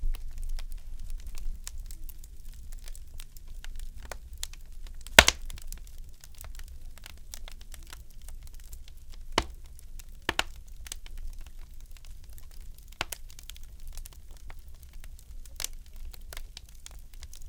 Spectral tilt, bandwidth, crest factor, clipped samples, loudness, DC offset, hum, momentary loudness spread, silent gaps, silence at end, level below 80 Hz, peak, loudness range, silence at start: -1.5 dB/octave; 18 kHz; 34 dB; under 0.1%; -29 LUFS; under 0.1%; none; 19 LU; none; 0 s; -40 dBFS; 0 dBFS; 19 LU; 0 s